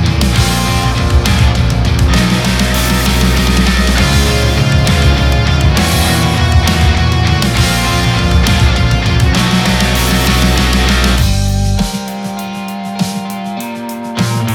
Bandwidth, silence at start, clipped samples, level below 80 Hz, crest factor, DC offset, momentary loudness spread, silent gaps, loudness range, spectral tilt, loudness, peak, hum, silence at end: 18 kHz; 0 s; under 0.1%; -16 dBFS; 10 dB; under 0.1%; 10 LU; none; 3 LU; -4.5 dB/octave; -12 LUFS; 0 dBFS; none; 0 s